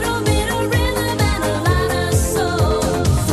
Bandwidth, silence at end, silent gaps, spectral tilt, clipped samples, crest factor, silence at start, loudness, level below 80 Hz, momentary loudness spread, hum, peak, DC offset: 13 kHz; 0 s; none; -5 dB/octave; under 0.1%; 14 dB; 0 s; -18 LUFS; -26 dBFS; 1 LU; none; -4 dBFS; under 0.1%